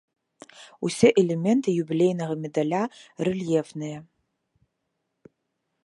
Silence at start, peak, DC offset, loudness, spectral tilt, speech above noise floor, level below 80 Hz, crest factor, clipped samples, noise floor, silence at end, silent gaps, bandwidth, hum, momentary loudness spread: 0.6 s; -4 dBFS; under 0.1%; -24 LUFS; -6.5 dB/octave; 55 dB; -66 dBFS; 22 dB; under 0.1%; -79 dBFS; 1.8 s; none; 11.5 kHz; none; 14 LU